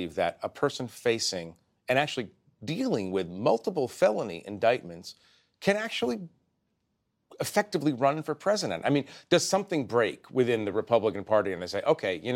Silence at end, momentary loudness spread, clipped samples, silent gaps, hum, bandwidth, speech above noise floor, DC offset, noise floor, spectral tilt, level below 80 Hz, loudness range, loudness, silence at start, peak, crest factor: 0 s; 10 LU; under 0.1%; none; none; 16.5 kHz; 50 dB; under 0.1%; -78 dBFS; -4.5 dB/octave; -72 dBFS; 4 LU; -28 LUFS; 0 s; -8 dBFS; 20 dB